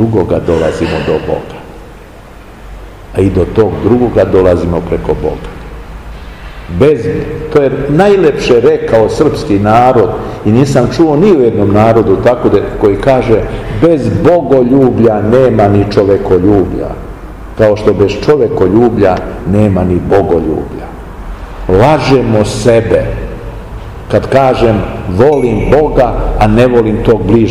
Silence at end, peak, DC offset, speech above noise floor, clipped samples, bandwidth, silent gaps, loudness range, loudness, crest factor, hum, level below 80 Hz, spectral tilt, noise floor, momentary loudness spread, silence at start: 0 s; 0 dBFS; 0.5%; 23 dB; 3%; 12.5 kHz; none; 4 LU; -9 LUFS; 10 dB; none; -24 dBFS; -7.5 dB/octave; -31 dBFS; 17 LU; 0 s